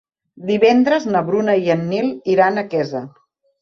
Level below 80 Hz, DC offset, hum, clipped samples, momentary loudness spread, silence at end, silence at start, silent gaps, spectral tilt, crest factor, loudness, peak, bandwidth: -62 dBFS; under 0.1%; none; under 0.1%; 9 LU; 0.5 s; 0.4 s; none; -6.5 dB/octave; 16 dB; -17 LUFS; -2 dBFS; 7 kHz